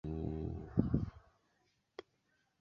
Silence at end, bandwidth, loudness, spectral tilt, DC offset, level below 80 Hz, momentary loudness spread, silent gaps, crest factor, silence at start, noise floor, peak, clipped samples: 0.6 s; 6.6 kHz; -39 LUFS; -10 dB/octave; under 0.1%; -50 dBFS; 20 LU; none; 26 dB; 0.05 s; -79 dBFS; -16 dBFS; under 0.1%